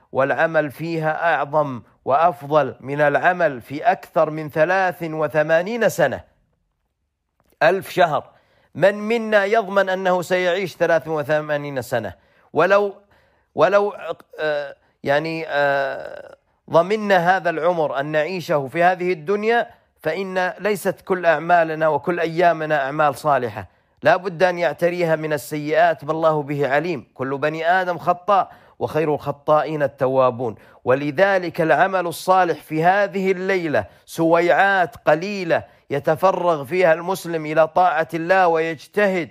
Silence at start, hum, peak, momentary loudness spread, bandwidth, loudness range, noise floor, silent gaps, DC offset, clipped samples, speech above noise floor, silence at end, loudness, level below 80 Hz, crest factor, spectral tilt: 0.15 s; none; -4 dBFS; 8 LU; 15.5 kHz; 3 LU; -74 dBFS; none; under 0.1%; under 0.1%; 55 dB; 0 s; -20 LUFS; -64 dBFS; 16 dB; -5.5 dB/octave